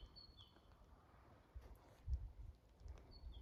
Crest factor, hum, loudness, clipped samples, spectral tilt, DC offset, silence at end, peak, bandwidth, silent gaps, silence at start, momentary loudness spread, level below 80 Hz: 22 dB; none; -57 LUFS; under 0.1%; -6.5 dB/octave; under 0.1%; 0 s; -32 dBFS; 13 kHz; none; 0 s; 18 LU; -56 dBFS